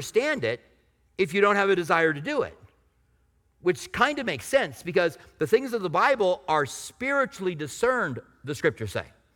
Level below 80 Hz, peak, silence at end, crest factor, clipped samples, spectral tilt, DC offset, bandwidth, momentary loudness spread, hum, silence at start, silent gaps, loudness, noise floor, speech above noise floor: -60 dBFS; -6 dBFS; 0.25 s; 20 dB; under 0.1%; -4.5 dB/octave; under 0.1%; 18.5 kHz; 11 LU; none; 0 s; none; -26 LUFS; -66 dBFS; 41 dB